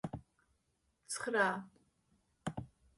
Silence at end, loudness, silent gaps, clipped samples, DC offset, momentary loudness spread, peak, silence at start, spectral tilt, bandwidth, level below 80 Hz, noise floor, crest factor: 0.3 s; -38 LUFS; none; under 0.1%; under 0.1%; 16 LU; -18 dBFS; 0.05 s; -4 dB/octave; 11.5 kHz; -66 dBFS; -80 dBFS; 24 dB